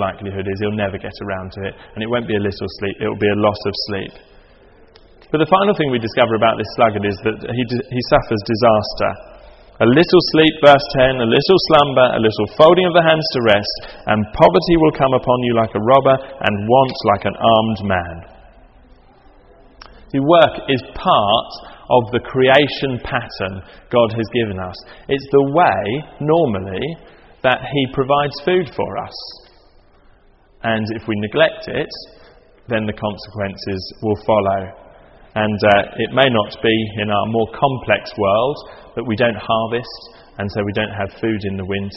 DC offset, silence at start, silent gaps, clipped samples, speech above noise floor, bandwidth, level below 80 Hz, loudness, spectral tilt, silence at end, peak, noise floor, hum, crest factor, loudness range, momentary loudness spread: under 0.1%; 0 s; none; under 0.1%; 34 dB; 8 kHz; -42 dBFS; -16 LUFS; -8 dB/octave; 0 s; 0 dBFS; -50 dBFS; none; 16 dB; 8 LU; 14 LU